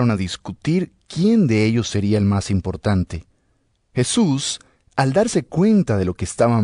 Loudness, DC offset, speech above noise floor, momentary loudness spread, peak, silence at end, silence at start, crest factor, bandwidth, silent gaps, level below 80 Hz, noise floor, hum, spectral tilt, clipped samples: -20 LUFS; under 0.1%; 46 dB; 11 LU; -4 dBFS; 0 s; 0 s; 14 dB; 11 kHz; none; -48 dBFS; -64 dBFS; none; -6 dB/octave; under 0.1%